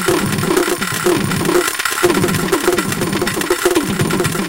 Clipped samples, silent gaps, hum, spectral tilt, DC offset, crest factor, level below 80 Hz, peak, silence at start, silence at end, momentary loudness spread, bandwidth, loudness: under 0.1%; none; none; -4 dB/octave; 0.2%; 14 dB; -40 dBFS; -2 dBFS; 0 s; 0 s; 3 LU; 17.5 kHz; -16 LUFS